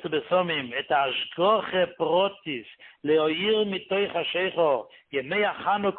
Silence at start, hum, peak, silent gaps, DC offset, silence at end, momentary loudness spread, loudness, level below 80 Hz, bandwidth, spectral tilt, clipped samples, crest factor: 0 s; none; -10 dBFS; none; under 0.1%; 0 s; 8 LU; -25 LUFS; -68 dBFS; 4.4 kHz; -9 dB/octave; under 0.1%; 16 dB